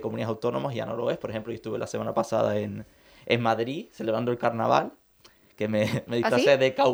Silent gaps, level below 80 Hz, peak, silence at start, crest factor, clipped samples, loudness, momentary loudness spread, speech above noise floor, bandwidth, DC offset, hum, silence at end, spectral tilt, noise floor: none; -64 dBFS; -6 dBFS; 0 s; 20 dB; under 0.1%; -27 LUFS; 13 LU; 31 dB; over 20 kHz; under 0.1%; none; 0 s; -6 dB/octave; -57 dBFS